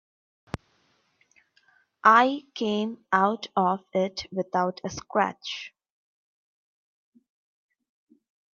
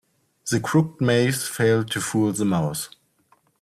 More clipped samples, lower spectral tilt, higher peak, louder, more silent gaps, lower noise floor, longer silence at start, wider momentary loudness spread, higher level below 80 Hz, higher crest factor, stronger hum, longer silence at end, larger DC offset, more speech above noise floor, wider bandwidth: neither; about the same, -5 dB/octave vs -5 dB/octave; about the same, -4 dBFS vs -6 dBFS; second, -25 LUFS vs -22 LUFS; neither; first, -68 dBFS vs -62 dBFS; first, 2.05 s vs 0.45 s; first, 20 LU vs 8 LU; about the same, -64 dBFS vs -60 dBFS; first, 24 dB vs 16 dB; neither; first, 2.85 s vs 0.75 s; neither; about the same, 43 dB vs 41 dB; second, 7.4 kHz vs 15.5 kHz